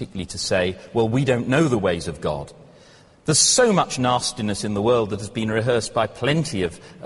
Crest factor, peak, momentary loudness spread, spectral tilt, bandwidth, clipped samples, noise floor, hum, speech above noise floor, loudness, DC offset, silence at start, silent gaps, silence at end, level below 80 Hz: 18 dB; -4 dBFS; 11 LU; -4 dB/octave; 11.5 kHz; under 0.1%; -50 dBFS; none; 29 dB; -21 LUFS; under 0.1%; 0 s; none; 0 s; -50 dBFS